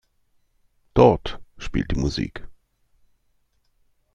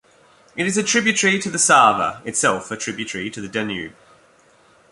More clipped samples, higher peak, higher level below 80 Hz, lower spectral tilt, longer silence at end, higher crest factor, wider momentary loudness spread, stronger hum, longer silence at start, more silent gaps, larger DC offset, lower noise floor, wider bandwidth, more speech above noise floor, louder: neither; about the same, -2 dBFS vs -2 dBFS; first, -38 dBFS vs -58 dBFS; first, -7 dB/octave vs -2.5 dB/octave; first, 1.6 s vs 1 s; about the same, 22 dB vs 20 dB; first, 20 LU vs 14 LU; neither; first, 0.95 s vs 0.55 s; neither; neither; first, -66 dBFS vs -54 dBFS; second, 9.4 kHz vs 11.5 kHz; first, 46 dB vs 34 dB; second, -22 LUFS vs -18 LUFS